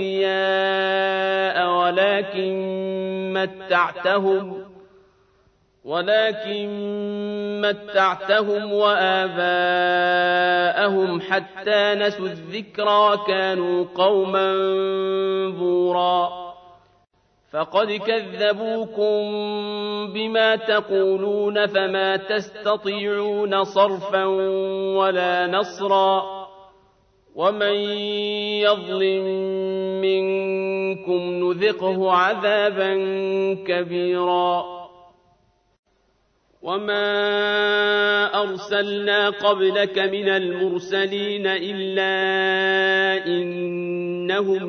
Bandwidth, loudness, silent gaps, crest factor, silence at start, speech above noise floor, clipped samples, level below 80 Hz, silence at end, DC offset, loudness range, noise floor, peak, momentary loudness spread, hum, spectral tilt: 6.6 kHz; -21 LUFS; 35.79-35.83 s; 18 dB; 0 s; 44 dB; under 0.1%; -70 dBFS; 0 s; under 0.1%; 5 LU; -64 dBFS; -4 dBFS; 8 LU; none; -5.5 dB/octave